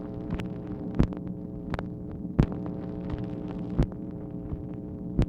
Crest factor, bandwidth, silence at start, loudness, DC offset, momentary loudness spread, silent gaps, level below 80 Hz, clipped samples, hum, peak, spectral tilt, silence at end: 24 dB; 7.8 kHz; 0 s; -33 LUFS; under 0.1%; 9 LU; none; -38 dBFS; under 0.1%; none; -6 dBFS; -9.5 dB/octave; 0 s